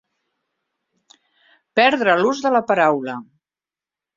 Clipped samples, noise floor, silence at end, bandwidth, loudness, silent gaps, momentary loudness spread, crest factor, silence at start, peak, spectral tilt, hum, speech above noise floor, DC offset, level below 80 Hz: under 0.1%; under -90 dBFS; 0.95 s; 7.6 kHz; -17 LUFS; none; 11 LU; 20 dB; 1.75 s; -2 dBFS; -4.5 dB/octave; none; over 73 dB; under 0.1%; -68 dBFS